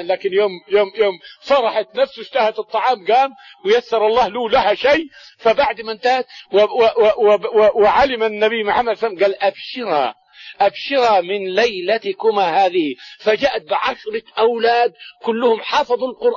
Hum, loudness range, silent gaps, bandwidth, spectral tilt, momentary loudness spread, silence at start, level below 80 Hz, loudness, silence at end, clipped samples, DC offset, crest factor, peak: none; 3 LU; none; 7.2 kHz; -4 dB/octave; 7 LU; 0 s; -52 dBFS; -17 LUFS; 0 s; under 0.1%; under 0.1%; 12 dB; -4 dBFS